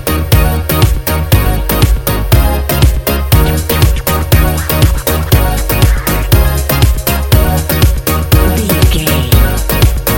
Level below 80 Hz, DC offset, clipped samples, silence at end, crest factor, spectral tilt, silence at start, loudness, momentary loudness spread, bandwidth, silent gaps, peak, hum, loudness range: -12 dBFS; 0.7%; 0.4%; 0 s; 10 dB; -5 dB/octave; 0 s; -11 LUFS; 2 LU; 17.5 kHz; none; 0 dBFS; none; 1 LU